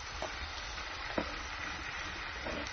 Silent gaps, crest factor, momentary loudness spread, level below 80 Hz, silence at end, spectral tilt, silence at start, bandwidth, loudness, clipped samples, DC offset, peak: none; 22 dB; 3 LU; -50 dBFS; 0 s; -1.5 dB/octave; 0 s; 6.6 kHz; -39 LUFS; under 0.1%; under 0.1%; -18 dBFS